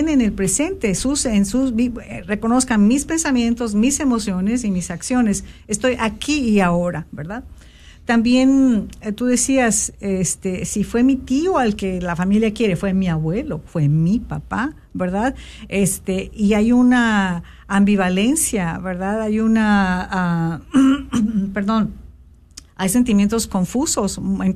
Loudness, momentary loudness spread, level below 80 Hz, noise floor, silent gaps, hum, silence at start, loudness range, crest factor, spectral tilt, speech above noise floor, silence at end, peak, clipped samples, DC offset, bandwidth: -18 LUFS; 9 LU; -38 dBFS; -45 dBFS; none; none; 0 s; 3 LU; 14 dB; -5 dB/octave; 27 dB; 0 s; -4 dBFS; under 0.1%; under 0.1%; 14 kHz